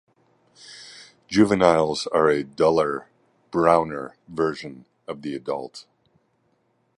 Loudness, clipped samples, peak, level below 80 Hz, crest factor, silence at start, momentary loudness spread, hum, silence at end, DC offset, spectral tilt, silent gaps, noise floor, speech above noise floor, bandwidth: -22 LUFS; under 0.1%; -2 dBFS; -56 dBFS; 22 dB; 0.7 s; 23 LU; none; 1.15 s; under 0.1%; -5.5 dB/octave; none; -68 dBFS; 46 dB; 11 kHz